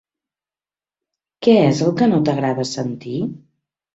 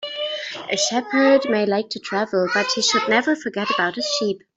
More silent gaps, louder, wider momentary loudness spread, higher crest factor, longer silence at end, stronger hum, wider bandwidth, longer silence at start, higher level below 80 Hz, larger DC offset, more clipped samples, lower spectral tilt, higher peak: neither; about the same, -18 LUFS vs -20 LUFS; first, 12 LU vs 9 LU; about the same, 18 dB vs 18 dB; first, 0.6 s vs 0.2 s; neither; about the same, 8 kHz vs 8.2 kHz; first, 1.4 s vs 0 s; first, -58 dBFS vs -66 dBFS; neither; neither; first, -6.5 dB/octave vs -2.5 dB/octave; about the same, -2 dBFS vs -4 dBFS